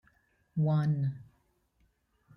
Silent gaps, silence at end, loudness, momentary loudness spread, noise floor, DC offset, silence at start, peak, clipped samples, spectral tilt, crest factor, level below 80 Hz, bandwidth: none; 1.15 s; -31 LUFS; 12 LU; -72 dBFS; under 0.1%; 0.55 s; -20 dBFS; under 0.1%; -10.5 dB/octave; 14 dB; -68 dBFS; 5.6 kHz